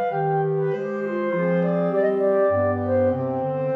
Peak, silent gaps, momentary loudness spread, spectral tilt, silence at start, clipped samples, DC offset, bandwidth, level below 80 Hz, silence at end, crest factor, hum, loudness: -10 dBFS; none; 5 LU; -10 dB/octave; 0 s; under 0.1%; under 0.1%; 5 kHz; -74 dBFS; 0 s; 12 dB; none; -22 LUFS